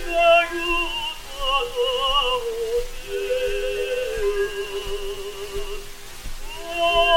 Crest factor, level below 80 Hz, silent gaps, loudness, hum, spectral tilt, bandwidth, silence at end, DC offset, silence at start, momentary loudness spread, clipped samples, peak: 18 dB; -34 dBFS; none; -23 LUFS; none; -2 dB/octave; 17 kHz; 0 s; under 0.1%; 0 s; 16 LU; under 0.1%; -6 dBFS